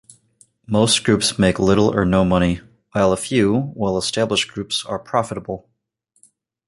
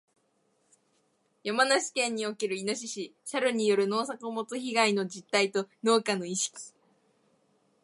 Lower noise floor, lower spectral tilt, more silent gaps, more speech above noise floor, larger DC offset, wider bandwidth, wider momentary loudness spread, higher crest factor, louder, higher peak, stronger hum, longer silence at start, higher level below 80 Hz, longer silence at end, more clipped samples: second, -67 dBFS vs -72 dBFS; first, -4.5 dB/octave vs -3 dB/octave; neither; first, 49 dB vs 43 dB; neither; about the same, 11.5 kHz vs 11.5 kHz; about the same, 11 LU vs 10 LU; about the same, 18 dB vs 22 dB; first, -19 LUFS vs -29 LUFS; first, -2 dBFS vs -10 dBFS; neither; second, 0.7 s vs 1.45 s; first, -42 dBFS vs -82 dBFS; about the same, 1.1 s vs 1.15 s; neither